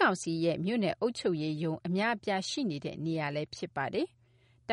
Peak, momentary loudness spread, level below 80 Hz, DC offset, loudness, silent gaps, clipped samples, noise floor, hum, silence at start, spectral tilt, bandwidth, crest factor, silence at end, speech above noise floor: -16 dBFS; 6 LU; -70 dBFS; under 0.1%; -33 LUFS; none; under 0.1%; -65 dBFS; none; 0 s; -5.5 dB/octave; 11 kHz; 18 dB; 0 s; 33 dB